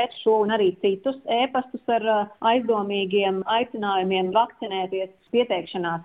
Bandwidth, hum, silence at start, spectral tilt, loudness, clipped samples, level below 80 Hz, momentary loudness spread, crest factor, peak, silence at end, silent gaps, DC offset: 4.8 kHz; none; 0 s; -8 dB/octave; -23 LUFS; under 0.1%; -68 dBFS; 6 LU; 16 dB; -8 dBFS; 0 s; none; under 0.1%